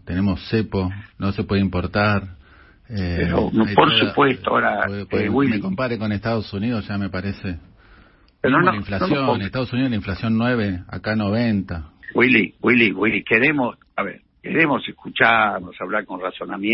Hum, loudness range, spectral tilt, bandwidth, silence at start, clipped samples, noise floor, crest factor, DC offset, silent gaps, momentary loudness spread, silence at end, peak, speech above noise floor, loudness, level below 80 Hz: none; 5 LU; -10.5 dB/octave; 5.8 kHz; 0.05 s; under 0.1%; -51 dBFS; 20 dB; under 0.1%; none; 12 LU; 0 s; -2 dBFS; 31 dB; -20 LUFS; -44 dBFS